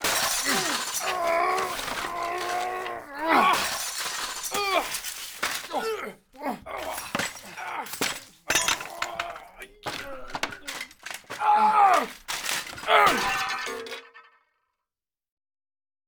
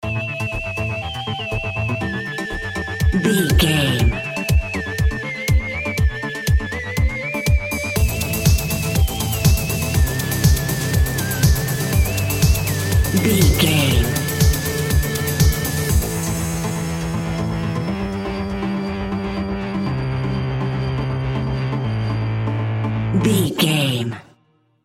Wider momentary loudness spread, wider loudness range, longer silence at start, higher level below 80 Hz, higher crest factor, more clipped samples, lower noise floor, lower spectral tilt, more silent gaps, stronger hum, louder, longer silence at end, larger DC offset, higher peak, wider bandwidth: first, 16 LU vs 7 LU; about the same, 7 LU vs 6 LU; about the same, 0 s vs 0 s; second, -56 dBFS vs -26 dBFS; about the same, 22 dB vs 18 dB; neither; first, under -90 dBFS vs -60 dBFS; second, -1 dB/octave vs -5 dB/octave; neither; neither; second, -26 LUFS vs -20 LUFS; first, 1.85 s vs 0.65 s; neither; second, -6 dBFS vs -2 dBFS; first, over 20 kHz vs 17 kHz